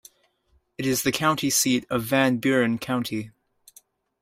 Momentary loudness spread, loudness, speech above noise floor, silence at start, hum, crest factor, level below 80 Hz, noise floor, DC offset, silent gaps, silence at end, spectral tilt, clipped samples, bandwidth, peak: 9 LU; -23 LUFS; 43 dB; 0.8 s; none; 18 dB; -60 dBFS; -67 dBFS; under 0.1%; none; 0.95 s; -3.5 dB/octave; under 0.1%; 16 kHz; -8 dBFS